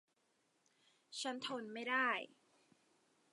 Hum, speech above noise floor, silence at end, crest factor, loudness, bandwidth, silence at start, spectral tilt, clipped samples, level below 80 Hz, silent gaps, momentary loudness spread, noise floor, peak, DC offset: none; 39 dB; 1.05 s; 22 dB; -40 LUFS; 11.5 kHz; 1.1 s; -2 dB/octave; under 0.1%; under -90 dBFS; none; 13 LU; -80 dBFS; -24 dBFS; under 0.1%